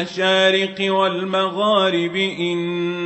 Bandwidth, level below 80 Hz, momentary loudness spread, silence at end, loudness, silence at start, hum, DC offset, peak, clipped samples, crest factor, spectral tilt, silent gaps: 8.4 kHz; -68 dBFS; 7 LU; 0 s; -18 LUFS; 0 s; none; under 0.1%; -4 dBFS; under 0.1%; 14 dB; -5 dB/octave; none